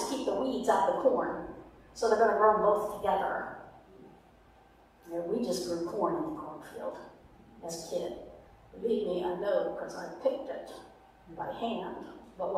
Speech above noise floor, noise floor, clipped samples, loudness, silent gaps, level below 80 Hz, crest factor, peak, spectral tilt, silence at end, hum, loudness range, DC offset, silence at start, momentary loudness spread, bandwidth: 29 dB; -60 dBFS; under 0.1%; -32 LUFS; none; -62 dBFS; 22 dB; -12 dBFS; -4.5 dB/octave; 0 s; none; 8 LU; under 0.1%; 0 s; 21 LU; 15.5 kHz